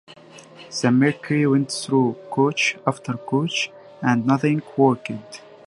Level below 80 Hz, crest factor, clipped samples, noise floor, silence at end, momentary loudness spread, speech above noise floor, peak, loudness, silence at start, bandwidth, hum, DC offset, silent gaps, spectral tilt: -66 dBFS; 20 dB; under 0.1%; -45 dBFS; 0.25 s; 10 LU; 24 dB; -2 dBFS; -21 LUFS; 0.1 s; 11.5 kHz; none; under 0.1%; none; -5.5 dB/octave